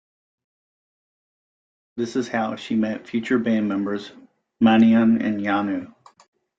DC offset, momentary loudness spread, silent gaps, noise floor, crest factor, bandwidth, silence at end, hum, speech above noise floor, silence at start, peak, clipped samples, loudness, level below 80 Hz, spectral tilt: under 0.1%; 15 LU; none; under -90 dBFS; 18 dB; 7.6 kHz; 0.75 s; none; over 70 dB; 1.95 s; -6 dBFS; under 0.1%; -21 LUFS; -64 dBFS; -6.5 dB/octave